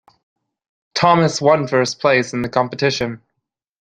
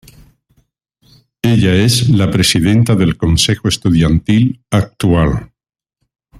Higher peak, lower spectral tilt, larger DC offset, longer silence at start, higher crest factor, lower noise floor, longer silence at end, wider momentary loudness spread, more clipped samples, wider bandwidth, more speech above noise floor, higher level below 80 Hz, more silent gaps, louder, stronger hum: about the same, 0 dBFS vs 0 dBFS; about the same, -5 dB/octave vs -5.5 dB/octave; neither; second, 0.95 s vs 1.45 s; about the same, 18 dB vs 14 dB; first, -77 dBFS vs -71 dBFS; second, 0.65 s vs 0.95 s; first, 11 LU vs 6 LU; neither; second, 9.8 kHz vs 15.5 kHz; about the same, 61 dB vs 59 dB; second, -54 dBFS vs -32 dBFS; neither; second, -17 LUFS vs -13 LUFS; neither